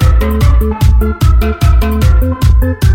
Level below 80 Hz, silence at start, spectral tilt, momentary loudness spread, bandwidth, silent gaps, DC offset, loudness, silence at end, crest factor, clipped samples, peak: -10 dBFS; 0 s; -7 dB/octave; 0 LU; 16.5 kHz; none; under 0.1%; -11 LUFS; 0 s; 8 dB; 0.2%; 0 dBFS